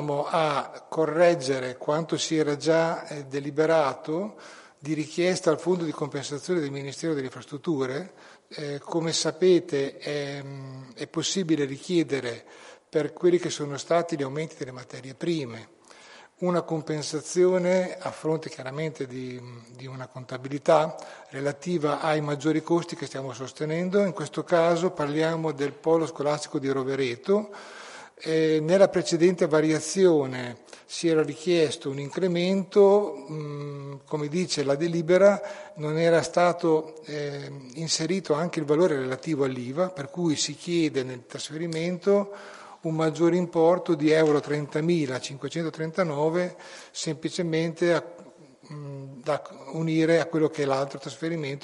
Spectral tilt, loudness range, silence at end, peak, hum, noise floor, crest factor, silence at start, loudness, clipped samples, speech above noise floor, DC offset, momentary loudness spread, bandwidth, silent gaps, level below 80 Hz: -5.5 dB/octave; 5 LU; 0.05 s; -6 dBFS; none; -50 dBFS; 20 dB; 0 s; -26 LUFS; under 0.1%; 25 dB; under 0.1%; 15 LU; 11.5 kHz; none; -72 dBFS